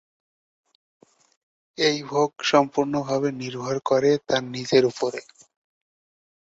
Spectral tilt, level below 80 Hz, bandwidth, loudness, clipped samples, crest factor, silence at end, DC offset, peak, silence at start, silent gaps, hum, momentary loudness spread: -4.5 dB/octave; -66 dBFS; 8 kHz; -23 LUFS; under 0.1%; 22 dB; 1.25 s; under 0.1%; -2 dBFS; 1.8 s; none; none; 9 LU